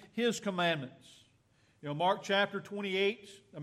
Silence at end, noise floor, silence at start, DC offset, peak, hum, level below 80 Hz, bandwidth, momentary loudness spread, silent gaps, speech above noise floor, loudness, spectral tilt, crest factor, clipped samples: 0 s; -69 dBFS; 0 s; under 0.1%; -16 dBFS; none; -80 dBFS; 14 kHz; 16 LU; none; 35 dB; -33 LUFS; -4.5 dB/octave; 18 dB; under 0.1%